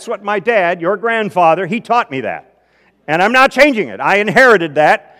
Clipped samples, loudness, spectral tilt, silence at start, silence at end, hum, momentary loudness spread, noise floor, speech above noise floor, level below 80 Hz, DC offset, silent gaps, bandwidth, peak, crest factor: 0.7%; -12 LUFS; -5 dB/octave; 0 s; 0.2 s; none; 10 LU; -54 dBFS; 42 dB; -52 dBFS; under 0.1%; none; over 20 kHz; 0 dBFS; 14 dB